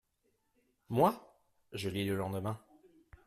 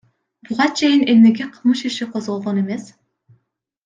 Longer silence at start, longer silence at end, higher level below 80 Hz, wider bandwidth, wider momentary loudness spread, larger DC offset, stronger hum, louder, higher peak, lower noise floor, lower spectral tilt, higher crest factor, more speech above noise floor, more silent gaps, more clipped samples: first, 0.9 s vs 0.5 s; second, 0.7 s vs 1 s; about the same, -68 dBFS vs -66 dBFS; first, 15.5 kHz vs 7.6 kHz; first, 17 LU vs 13 LU; neither; neither; second, -35 LUFS vs -17 LUFS; second, -14 dBFS vs -2 dBFS; first, -78 dBFS vs -69 dBFS; first, -6.5 dB/octave vs -5 dB/octave; first, 24 dB vs 16 dB; second, 45 dB vs 52 dB; neither; neither